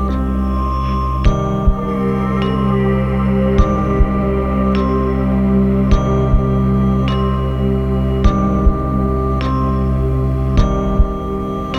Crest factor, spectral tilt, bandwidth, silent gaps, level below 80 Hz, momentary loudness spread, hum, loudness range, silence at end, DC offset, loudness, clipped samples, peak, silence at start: 14 dB; -9 dB/octave; 6.6 kHz; none; -18 dBFS; 4 LU; none; 1 LU; 0 s; 0.3%; -16 LUFS; under 0.1%; 0 dBFS; 0 s